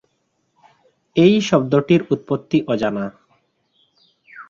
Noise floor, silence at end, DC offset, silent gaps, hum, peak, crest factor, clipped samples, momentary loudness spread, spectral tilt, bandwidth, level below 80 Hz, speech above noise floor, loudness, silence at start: -68 dBFS; 0.05 s; under 0.1%; none; none; -2 dBFS; 18 dB; under 0.1%; 9 LU; -6.5 dB/octave; 7.4 kHz; -58 dBFS; 52 dB; -18 LUFS; 1.15 s